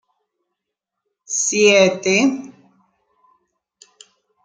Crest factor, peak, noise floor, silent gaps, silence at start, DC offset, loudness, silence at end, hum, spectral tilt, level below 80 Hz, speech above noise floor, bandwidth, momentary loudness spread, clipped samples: 20 dB; -2 dBFS; -82 dBFS; none; 1.3 s; under 0.1%; -15 LUFS; 2 s; none; -2.5 dB/octave; -66 dBFS; 66 dB; 10 kHz; 11 LU; under 0.1%